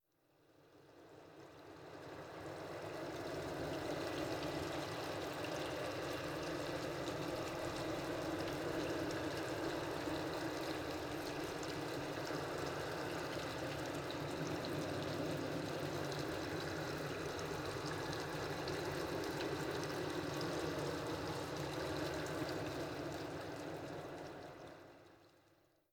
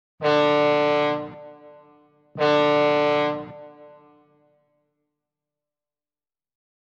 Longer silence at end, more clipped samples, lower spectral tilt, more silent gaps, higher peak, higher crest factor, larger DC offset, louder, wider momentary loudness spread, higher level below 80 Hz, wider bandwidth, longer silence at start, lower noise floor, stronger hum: second, 0.6 s vs 3.05 s; neither; about the same, -5 dB/octave vs -6 dB/octave; neither; second, -28 dBFS vs -8 dBFS; about the same, 14 dB vs 16 dB; neither; second, -43 LUFS vs -21 LUFS; second, 8 LU vs 22 LU; about the same, -64 dBFS vs -68 dBFS; first, over 20 kHz vs 7.6 kHz; first, 0.6 s vs 0.2 s; second, -74 dBFS vs under -90 dBFS; neither